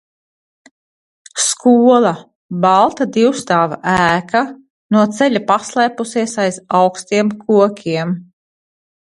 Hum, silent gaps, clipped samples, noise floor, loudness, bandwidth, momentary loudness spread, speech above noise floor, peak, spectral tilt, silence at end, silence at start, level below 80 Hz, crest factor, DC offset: none; 2.35-2.49 s, 4.70-4.89 s; under 0.1%; under -90 dBFS; -14 LUFS; 11.5 kHz; 9 LU; over 76 dB; 0 dBFS; -4.5 dB/octave; 0.95 s; 1.35 s; -54 dBFS; 16 dB; under 0.1%